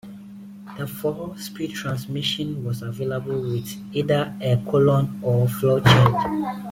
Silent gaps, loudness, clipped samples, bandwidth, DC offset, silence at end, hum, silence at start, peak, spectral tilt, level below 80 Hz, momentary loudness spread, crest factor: none; -22 LUFS; under 0.1%; 16.5 kHz; under 0.1%; 0 s; none; 0.05 s; -2 dBFS; -6.5 dB/octave; -50 dBFS; 16 LU; 20 dB